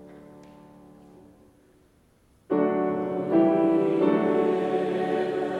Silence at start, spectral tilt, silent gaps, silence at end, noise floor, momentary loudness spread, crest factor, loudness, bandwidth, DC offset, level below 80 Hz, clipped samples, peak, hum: 0 s; -8.5 dB/octave; none; 0 s; -61 dBFS; 5 LU; 16 dB; -24 LUFS; 9 kHz; under 0.1%; -68 dBFS; under 0.1%; -10 dBFS; none